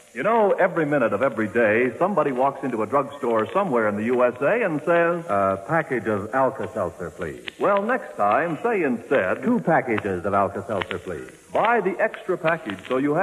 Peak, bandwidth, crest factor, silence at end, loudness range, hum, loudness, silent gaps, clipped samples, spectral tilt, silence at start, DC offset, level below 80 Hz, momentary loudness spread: -6 dBFS; 13.5 kHz; 16 dB; 0 s; 2 LU; none; -22 LUFS; none; under 0.1%; -7 dB/octave; 0.15 s; under 0.1%; -62 dBFS; 8 LU